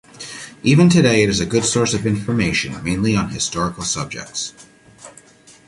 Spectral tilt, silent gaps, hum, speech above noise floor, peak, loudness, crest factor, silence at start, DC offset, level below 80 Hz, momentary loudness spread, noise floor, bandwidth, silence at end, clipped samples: -4.5 dB/octave; none; none; 29 dB; -2 dBFS; -18 LUFS; 16 dB; 0.15 s; under 0.1%; -44 dBFS; 14 LU; -47 dBFS; 11.5 kHz; 0.6 s; under 0.1%